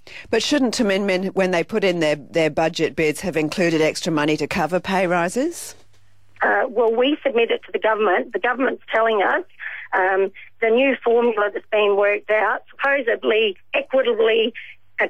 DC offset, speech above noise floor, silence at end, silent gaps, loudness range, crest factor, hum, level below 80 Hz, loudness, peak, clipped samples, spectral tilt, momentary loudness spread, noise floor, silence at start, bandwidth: 0.5%; 38 dB; 0 s; none; 2 LU; 12 dB; none; -58 dBFS; -20 LUFS; -8 dBFS; under 0.1%; -4.5 dB/octave; 6 LU; -58 dBFS; 0.05 s; 15 kHz